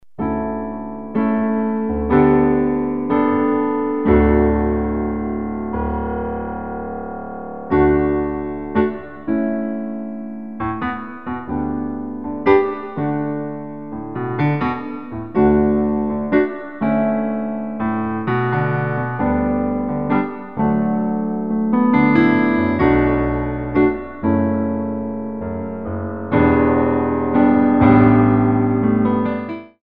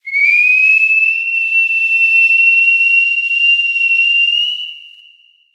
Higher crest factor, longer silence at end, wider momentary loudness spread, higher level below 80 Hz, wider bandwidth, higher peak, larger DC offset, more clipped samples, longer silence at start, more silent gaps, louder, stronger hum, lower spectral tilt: first, 18 dB vs 10 dB; second, 0 s vs 0.7 s; first, 13 LU vs 5 LU; first, -34 dBFS vs under -90 dBFS; second, 5.2 kHz vs 10.5 kHz; about the same, 0 dBFS vs -2 dBFS; first, 0.9% vs under 0.1%; neither; about the same, 0 s vs 0.05 s; neither; second, -19 LUFS vs -9 LUFS; neither; first, -11 dB/octave vs 11 dB/octave